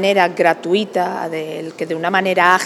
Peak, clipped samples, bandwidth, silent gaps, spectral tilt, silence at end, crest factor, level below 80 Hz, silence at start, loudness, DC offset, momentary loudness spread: 0 dBFS; under 0.1%; 15 kHz; none; -4.5 dB/octave; 0 s; 16 dB; -74 dBFS; 0 s; -17 LUFS; under 0.1%; 11 LU